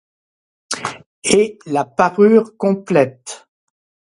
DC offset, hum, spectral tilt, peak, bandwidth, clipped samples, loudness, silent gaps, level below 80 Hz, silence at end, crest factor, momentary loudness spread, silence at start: under 0.1%; none; -4.5 dB/octave; 0 dBFS; 11.5 kHz; under 0.1%; -16 LUFS; 1.06-1.22 s; -58 dBFS; 0.75 s; 18 dB; 16 LU; 0.7 s